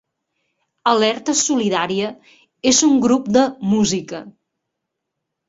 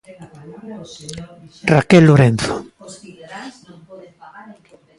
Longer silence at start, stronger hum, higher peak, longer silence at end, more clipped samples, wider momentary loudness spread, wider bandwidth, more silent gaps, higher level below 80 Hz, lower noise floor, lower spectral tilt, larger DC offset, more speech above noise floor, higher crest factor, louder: first, 0.85 s vs 0.2 s; neither; about the same, -2 dBFS vs 0 dBFS; second, 1.2 s vs 1.5 s; neither; second, 10 LU vs 27 LU; second, 8 kHz vs 11.5 kHz; neither; second, -56 dBFS vs -48 dBFS; first, -79 dBFS vs -45 dBFS; second, -3.5 dB/octave vs -7 dB/octave; neither; first, 62 dB vs 31 dB; about the same, 18 dB vs 18 dB; second, -17 LUFS vs -13 LUFS